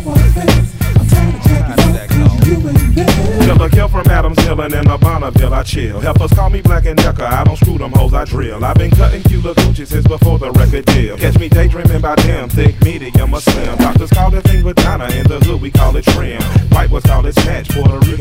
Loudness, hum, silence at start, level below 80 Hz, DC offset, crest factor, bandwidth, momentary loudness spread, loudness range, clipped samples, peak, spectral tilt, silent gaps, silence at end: -12 LUFS; none; 0 s; -16 dBFS; under 0.1%; 10 dB; 16.5 kHz; 4 LU; 1 LU; 2%; 0 dBFS; -6.5 dB/octave; none; 0 s